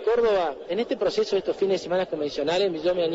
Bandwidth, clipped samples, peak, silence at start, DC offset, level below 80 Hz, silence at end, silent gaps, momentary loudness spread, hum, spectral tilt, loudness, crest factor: 8 kHz; under 0.1%; -12 dBFS; 0 s; under 0.1%; -56 dBFS; 0 s; none; 6 LU; none; -5 dB/octave; -25 LUFS; 12 dB